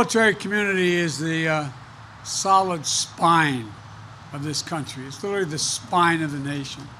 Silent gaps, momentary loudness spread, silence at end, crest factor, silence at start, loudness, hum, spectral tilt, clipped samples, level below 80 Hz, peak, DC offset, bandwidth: none; 19 LU; 0 s; 18 dB; 0 s; -22 LUFS; none; -3.5 dB/octave; under 0.1%; -58 dBFS; -4 dBFS; under 0.1%; 15 kHz